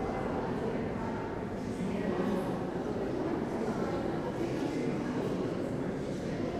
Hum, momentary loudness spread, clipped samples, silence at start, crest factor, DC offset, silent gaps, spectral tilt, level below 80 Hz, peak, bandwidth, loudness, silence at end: none; 3 LU; under 0.1%; 0 s; 14 dB; under 0.1%; none; -7.5 dB/octave; -52 dBFS; -20 dBFS; 14 kHz; -34 LUFS; 0 s